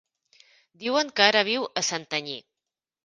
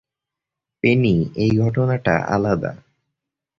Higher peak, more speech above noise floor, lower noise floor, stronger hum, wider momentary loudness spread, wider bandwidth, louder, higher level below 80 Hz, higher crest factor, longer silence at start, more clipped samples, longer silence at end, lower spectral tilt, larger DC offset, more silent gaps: about the same, 0 dBFS vs -2 dBFS; second, 63 dB vs 67 dB; about the same, -88 dBFS vs -85 dBFS; neither; first, 15 LU vs 5 LU; first, 10.5 kHz vs 7.2 kHz; second, -24 LUFS vs -19 LUFS; second, -74 dBFS vs -46 dBFS; first, 26 dB vs 18 dB; about the same, 0.8 s vs 0.85 s; neither; second, 0.65 s vs 0.85 s; second, -1.5 dB/octave vs -8 dB/octave; neither; neither